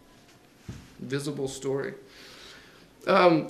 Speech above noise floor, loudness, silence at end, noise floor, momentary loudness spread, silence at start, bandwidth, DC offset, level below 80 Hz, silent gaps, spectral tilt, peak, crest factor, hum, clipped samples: 30 dB; -28 LUFS; 0 s; -56 dBFS; 25 LU; 0.7 s; 13.5 kHz; under 0.1%; -62 dBFS; none; -5.5 dB/octave; -8 dBFS; 22 dB; none; under 0.1%